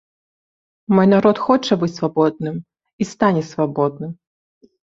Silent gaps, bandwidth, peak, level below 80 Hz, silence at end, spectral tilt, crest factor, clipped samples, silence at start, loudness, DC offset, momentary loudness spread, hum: 2.93-2.98 s; 7.8 kHz; -2 dBFS; -58 dBFS; 0.75 s; -7 dB/octave; 18 dB; under 0.1%; 0.9 s; -18 LUFS; under 0.1%; 14 LU; none